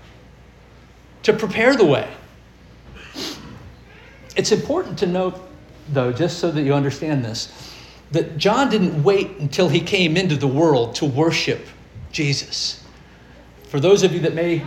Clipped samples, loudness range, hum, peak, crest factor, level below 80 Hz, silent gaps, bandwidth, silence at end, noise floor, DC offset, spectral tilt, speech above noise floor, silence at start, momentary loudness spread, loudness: under 0.1%; 6 LU; none; -2 dBFS; 18 dB; -50 dBFS; none; 16 kHz; 0 s; -46 dBFS; under 0.1%; -5.5 dB/octave; 28 dB; 1.25 s; 16 LU; -19 LUFS